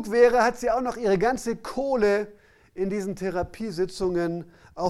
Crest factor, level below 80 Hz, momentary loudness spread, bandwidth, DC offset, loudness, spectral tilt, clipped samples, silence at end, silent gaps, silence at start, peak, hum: 18 dB; -48 dBFS; 12 LU; 13 kHz; under 0.1%; -25 LUFS; -5.5 dB/octave; under 0.1%; 0 s; none; 0 s; -6 dBFS; none